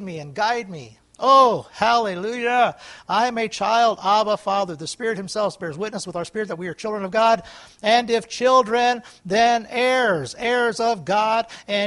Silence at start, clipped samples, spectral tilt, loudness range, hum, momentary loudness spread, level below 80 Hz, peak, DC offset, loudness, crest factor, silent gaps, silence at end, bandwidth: 0 s; under 0.1%; -3.5 dB/octave; 5 LU; none; 11 LU; -62 dBFS; -2 dBFS; under 0.1%; -20 LUFS; 18 dB; none; 0 s; 11.5 kHz